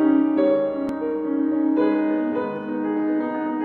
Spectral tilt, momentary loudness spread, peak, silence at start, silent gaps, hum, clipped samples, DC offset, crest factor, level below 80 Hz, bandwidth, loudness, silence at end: -9 dB/octave; 7 LU; -8 dBFS; 0 s; none; none; under 0.1%; under 0.1%; 14 dB; -64 dBFS; 4.3 kHz; -22 LUFS; 0 s